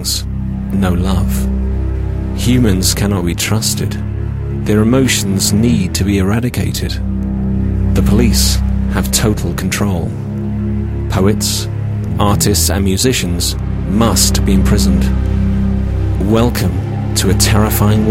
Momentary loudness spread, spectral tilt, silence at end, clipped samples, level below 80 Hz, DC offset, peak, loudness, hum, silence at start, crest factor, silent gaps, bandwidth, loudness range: 8 LU; -5 dB/octave; 0 s; under 0.1%; -20 dBFS; under 0.1%; 0 dBFS; -14 LUFS; none; 0 s; 14 dB; none; 16.5 kHz; 2 LU